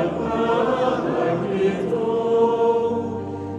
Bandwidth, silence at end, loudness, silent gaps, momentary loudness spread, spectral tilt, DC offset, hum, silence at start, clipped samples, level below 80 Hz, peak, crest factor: 8.8 kHz; 0 s; -21 LUFS; none; 5 LU; -7.5 dB/octave; under 0.1%; none; 0 s; under 0.1%; -52 dBFS; -8 dBFS; 14 dB